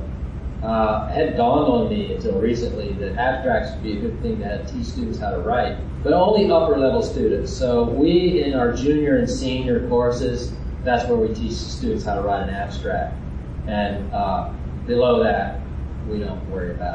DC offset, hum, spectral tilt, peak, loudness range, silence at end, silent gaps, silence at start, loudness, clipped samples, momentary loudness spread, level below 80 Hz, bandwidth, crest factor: under 0.1%; none; -7 dB/octave; -6 dBFS; 5 LU; 0 s; none; 0 s; -21 LUFS; under 0.1%; 11 LU; -32 dBFS; 9.2 kHz; 16 dB